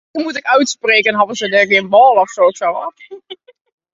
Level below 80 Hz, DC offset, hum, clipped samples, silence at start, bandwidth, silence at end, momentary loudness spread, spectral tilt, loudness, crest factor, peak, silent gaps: -64 dBFS; under 0.1%; none; under 0.1%; 0.15 s; 8 kHz; 0.6 s; 15 LU; -3 dB/octave; -12 LUFS; 14 dB; 0 dBFS; none